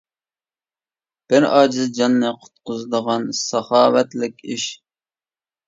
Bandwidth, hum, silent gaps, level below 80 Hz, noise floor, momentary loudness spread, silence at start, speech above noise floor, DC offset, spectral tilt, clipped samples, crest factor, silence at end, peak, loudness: 7.8 kHz; none; none; -68 dBFS; under -90 dBFS; 12 LU; 1.3 s; over 72 dB; under 0.1%; -4 dB/octave; under 0.1%; 20 dB; 0.9 s; 0 dBFS; -18 LUFS